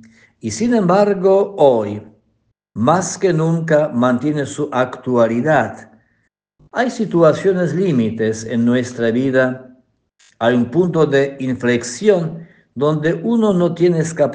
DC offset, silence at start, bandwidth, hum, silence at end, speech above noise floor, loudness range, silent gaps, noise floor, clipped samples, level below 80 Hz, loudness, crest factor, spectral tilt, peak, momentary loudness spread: under 0.1%; 0.45 s; 9.8 kHz; none; 0 s; 50 dB; 2 LU; none; -65 dBFS; under 0.1%; -58 dBFS; -16 LUFS; 16 dB; -6.5 dB/octave; 0 dBFS; 7 LU